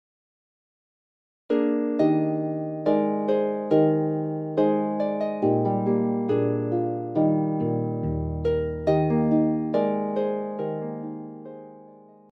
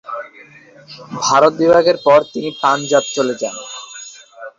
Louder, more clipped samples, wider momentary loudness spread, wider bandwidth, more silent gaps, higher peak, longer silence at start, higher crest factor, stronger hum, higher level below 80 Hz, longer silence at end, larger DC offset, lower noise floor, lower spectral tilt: second, -25 LUFS vs -14 LUFS; neither; second, 8 LU vs 20 LU; second, 5.8 kHz vs 7.8 kHz; neither; second, -8 dBFS vs -2 dBFS; first, 1.5 s vs 0.05 s; about the same, 16 dB vs 16 dB; neither; first, -48 dBFS vs -58 dBFS; first, 0.35 s vs 0.1 s; neither; first, -49 dBFS vs -43 dBFS; first, -10.5 dB/octave vs -3.5 dB/octave